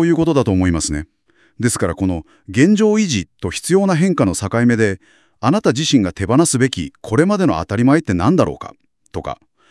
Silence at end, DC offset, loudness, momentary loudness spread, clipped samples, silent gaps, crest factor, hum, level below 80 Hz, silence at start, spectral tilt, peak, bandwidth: 0.35 s; under 0.1%; -16 LUFS; 13 LU; under 0.1%; none; 16 dB; none; -44 dBFS; 0 s; -5.5 dB/octave; 0 dBFS; 12 kHz